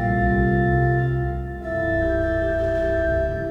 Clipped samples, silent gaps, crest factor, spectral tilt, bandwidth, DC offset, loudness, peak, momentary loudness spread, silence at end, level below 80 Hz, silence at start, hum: under 0.1%; none; 12 dB; -9.5 dB/octave; 6.2 kHz; under 0.1%; -22 LUFS; -8 dBFS; 6 LU; 0 s; -30 dBFS; 0 s; none